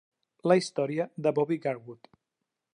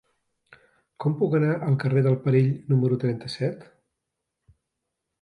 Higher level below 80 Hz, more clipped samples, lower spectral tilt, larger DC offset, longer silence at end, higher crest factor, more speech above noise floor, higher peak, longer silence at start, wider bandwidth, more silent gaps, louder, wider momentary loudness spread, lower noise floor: second, -80 dBFS vs -66 dBFS; neither; second, -6 dB/octave vs -9 dB/octave; neither; second, 0.8 s vs 1.6 s; about the same, 20 dB vs 18 dB; about the same, 57 dB vs 60 dB; about the same, -10 dBFS vs -8 dBFS; second, 0.45 s vs 1 s; about the same, 11 kHz vs 10.5 kHz; neither; second, -28 LUFS vs -24 LUFS; first, 11 LU vs 8 LU; about the same, -85 dBFS vs -83 dBFS